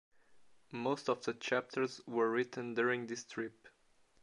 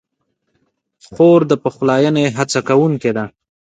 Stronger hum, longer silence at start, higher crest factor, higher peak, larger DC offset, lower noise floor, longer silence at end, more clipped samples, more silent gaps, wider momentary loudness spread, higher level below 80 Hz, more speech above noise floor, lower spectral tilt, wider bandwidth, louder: neither; second, 0.3 s vs 1.1 s; about the same, 20 dB vs 16 dB; second, -18 dBFS vs 0 dBFS; neither; about the same, -69 dBFS vs -70 dBFS; first, 0.55 s vs 0.4 s; neither; neither; about the same, 9 LU vs 9 LU; second, -82 dBFS vs -58 dBFS; second, 32 dB vs 57 dB; second, -4.5 dB/octave vs -6 dB/octave; first, 11 kHz vs 9.4 kHz; second, -37 LUFS vs -14 LUFS